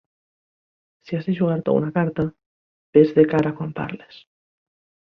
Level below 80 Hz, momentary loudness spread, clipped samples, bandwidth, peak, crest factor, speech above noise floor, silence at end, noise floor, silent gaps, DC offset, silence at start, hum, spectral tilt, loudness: -56 dBFS; 14 LU; under 0.1%; 6.2 kHz; -2 dBFS; 20 dB; over 70 dB; 1.1 s; under -90 dBFS; 2.46-2.93 s; under 0.1%; 1.1 s; none; -10 dB/octave; -21 LUFS